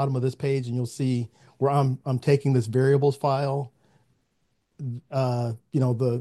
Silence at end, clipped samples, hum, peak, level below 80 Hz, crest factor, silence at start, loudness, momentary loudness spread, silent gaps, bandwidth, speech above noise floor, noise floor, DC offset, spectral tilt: 0 s; under 0.1%; none; -8 dBFS; -66 dBFS; 18 dB; 0 s; -25 LUFS; 10 LU; none; 12 kHz; 49 dB; -73 dBFS; under 0.1%; -8 dB/octave